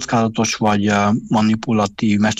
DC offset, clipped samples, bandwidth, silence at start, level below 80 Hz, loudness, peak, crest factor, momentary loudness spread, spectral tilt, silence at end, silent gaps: under 0.1%; under 0.1%; 9.2 kHz; 0 s; -50 dBFS; -17 LUFS; -6 dBFS; 10 dB; 2 LU; -5 dB/octave; 0.05 s; none